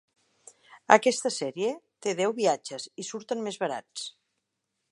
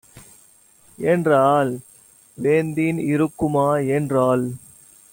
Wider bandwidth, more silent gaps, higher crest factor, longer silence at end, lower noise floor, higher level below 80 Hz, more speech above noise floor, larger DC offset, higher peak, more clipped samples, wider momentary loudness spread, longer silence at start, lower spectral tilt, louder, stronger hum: second, 11.5 kHz vs 17 kHz; neither; first, 28 dB vs 16 dB; first, 0.8 s vs 0.55 s; first, -82 dBFS vs -53 dBFS; second, -84 dBFS vs -56 dBFS; first, 54 dB vs 34 dB; neither; about the same, -2 dBFS vs -4 dBFS; neither; first, 17 LU vs 10 LU; first, 0.7 s vs 0.15 s; second, -3 dB/octave vs -7 dB/octave; second, -28 LUFS vs -20 LUFS; neither